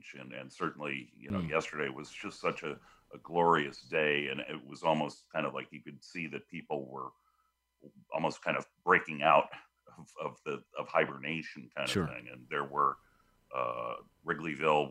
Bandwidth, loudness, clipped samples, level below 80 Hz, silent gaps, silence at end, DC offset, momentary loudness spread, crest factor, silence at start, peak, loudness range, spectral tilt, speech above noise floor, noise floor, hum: 15.5 kHz; -34 LUFS; under 0.1%; -70 dBFS; none; 0 s; under 0.1%; 16 LU; 24 dB; 0.05 s; -10 dBFS; 6 LU; -5 dB/octave; 43 dB; -77 dBFS; none